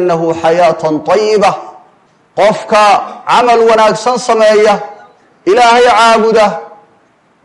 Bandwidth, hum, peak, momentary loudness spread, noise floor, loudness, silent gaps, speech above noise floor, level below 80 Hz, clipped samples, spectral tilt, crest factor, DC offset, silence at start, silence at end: 11.5 kHz; none; 0 dBFS; 9 LU; -50 dBFS; -9 LUFS; none; 42 dB; -50 dBFS; under 0.1%; -4 dB/octave; 10 dB; under 0.1%; 0 s; 0.75 s